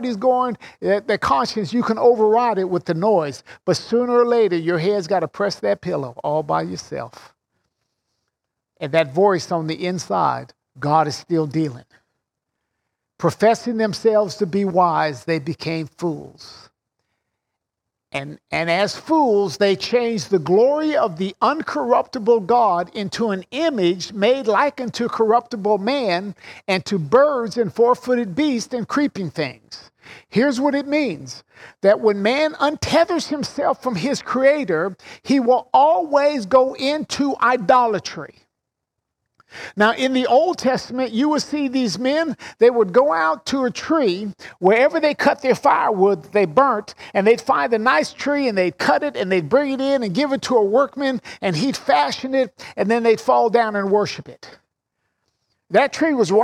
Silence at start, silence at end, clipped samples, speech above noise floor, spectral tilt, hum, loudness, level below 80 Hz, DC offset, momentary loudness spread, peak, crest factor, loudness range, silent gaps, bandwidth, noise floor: 0 s; 0 s; under 0.1%; 63 dB; -5.5 dB/octave; none; -19 LUFS; -60 dBFS; under 0.1%; 10 LU; -2 dBFS; 16 dB; 5 LU; none; 13.5 kHz; -82 dBFS